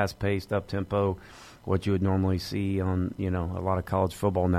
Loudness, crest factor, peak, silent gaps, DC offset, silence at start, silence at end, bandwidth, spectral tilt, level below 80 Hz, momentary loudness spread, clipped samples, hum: -28 LUFS; 16 dB; -12 dBFS; none; under 0.1%; 0 s; 0 s; 14.5 kHz; -7.5 dB/octave; -48 dBFS; 4 LU; under 0.1%; none